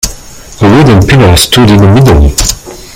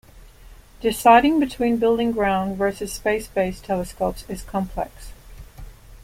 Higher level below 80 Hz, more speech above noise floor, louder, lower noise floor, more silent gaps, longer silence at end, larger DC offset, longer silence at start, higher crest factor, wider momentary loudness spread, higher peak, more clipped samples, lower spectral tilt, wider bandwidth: first, -16 dBFS vs -42 dBFS; about the same, 23 dB vs 25 dB; first, -4 LUFS vs -21 LUFS; second, -26 dBFS vs -45 dBFS; neither; first, 0.15 s vs 0 s; neither; about the same, 0.05 s vs 0.15 s; second, 4 dB vs 20 dB; second, 8 LU vs 14 LU; about the same, 0 dBFS vs -2 dBFS; first, 6% vs under 0.1%; about the same, -5 dB/octave vs -5 dB/octave; first, over 20 kHz vs 16.5 kHz